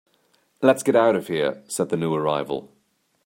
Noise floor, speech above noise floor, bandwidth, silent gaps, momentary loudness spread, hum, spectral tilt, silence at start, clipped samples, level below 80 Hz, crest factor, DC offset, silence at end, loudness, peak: -65 dBFS; 43 dB; 16.5 kHz; none; 9 LU; none; -5 dB/octave; 0.6 s; under 0.1%; -66 dBFS; 20 dB; under 0.1%; 0.6 s; -22 LUFS; -2 dBFS